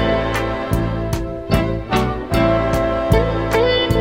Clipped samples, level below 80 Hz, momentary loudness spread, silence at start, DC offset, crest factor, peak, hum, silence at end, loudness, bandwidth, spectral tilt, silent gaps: under 0.1%; -26 dBFS; 5 LU; 0 s; 0.3%; 16 dB; 0 dBFS; none; 0 s; -18 LUFS; 17 kHz; -6 dB/octave; none